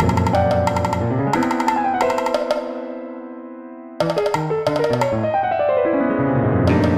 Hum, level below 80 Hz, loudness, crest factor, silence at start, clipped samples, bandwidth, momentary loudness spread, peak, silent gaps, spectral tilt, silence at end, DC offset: none; -42 dBFS; -19 LUFS; 16 dB; 0 s; under 0.1%; 15.5 kHz; 15 LU; -4 dBFS; none; -7 dB/octave; 0 s; under 0.1%